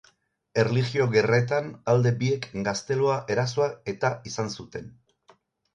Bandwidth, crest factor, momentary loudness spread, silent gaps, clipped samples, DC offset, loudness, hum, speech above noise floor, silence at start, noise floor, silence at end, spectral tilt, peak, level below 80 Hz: 9.2 kHz; 18 dB; 9 LU; none; under 0.1%; under 0.1%; -25 LUFS; none; 40 dB; 0.55 s; -65 dBFS; 0.85 s; -6 dB/octave; -8 dBFS; -60 dBFS